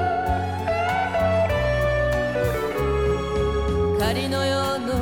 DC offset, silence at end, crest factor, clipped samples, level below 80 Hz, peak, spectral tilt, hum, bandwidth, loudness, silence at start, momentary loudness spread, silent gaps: 0.3%; 0 s; 12 dB; under 0.1%; -32 dBFS; -10 dBFS; -6 dB/octave; none; 18.5 kHz; -23 LUFS; 0 s; 3 LU; none